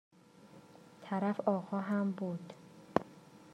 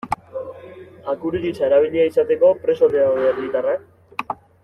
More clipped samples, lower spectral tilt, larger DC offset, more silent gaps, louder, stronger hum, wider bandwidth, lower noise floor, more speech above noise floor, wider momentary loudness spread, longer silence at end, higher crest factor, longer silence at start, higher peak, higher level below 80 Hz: neither; about the same, -8 dB/octave vs -7 dB/octave; neither; neither; second, -36 LUFS vs -19 LUFS; neither; about the same, 9.8 kHz vs 10.5 kHz; first, -59 dBFS vs -40 dBFS; about the same, 24 dB vs 22 dB; first, 23 LU vs 16 LU; second, 0 s vs 0.3 s; first, 28 dB vs 14 dB; first, 0.45 s vs 0.05 s; second, -10 dBFS vs -4 dBFS; second, -76 dBFS vs -56 dBFS